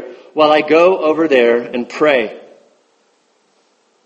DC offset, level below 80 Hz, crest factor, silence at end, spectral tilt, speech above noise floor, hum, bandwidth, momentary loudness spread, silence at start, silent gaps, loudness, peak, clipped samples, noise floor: under 0.1%; -64 dBFS; 16 dB; 1.65 s; -5 dB/octave; 46 dB; none; 8.2 kHz; 11 LU; 0 s; none; -13 LUFS; 0 dBFS; under 0.1%; -58 dBFS